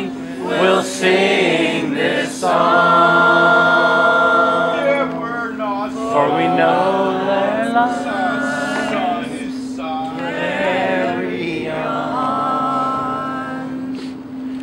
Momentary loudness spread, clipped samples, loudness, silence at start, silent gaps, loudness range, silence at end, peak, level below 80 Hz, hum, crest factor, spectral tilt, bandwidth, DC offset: 13 LU; under 0.1%; -16 LUFS; 0 s; none; 7 LU; 0 s; 0 dBFS; -54 dBFS; none; 16 dB; -4.5 dB/octave; 15.5 kHz; under 0.1%